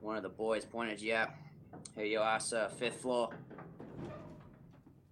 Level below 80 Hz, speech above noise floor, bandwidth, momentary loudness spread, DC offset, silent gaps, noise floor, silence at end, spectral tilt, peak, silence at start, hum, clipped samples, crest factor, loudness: -70 dBFS; 22 dB; 12.5 kHz; 20 LU; under 0.1%; none; -60 dBFS; 0.2 s; -3.5 dB/octave; -20 dBFS; 0 s; none; under 0.1%; 20 dB; -37 LUFS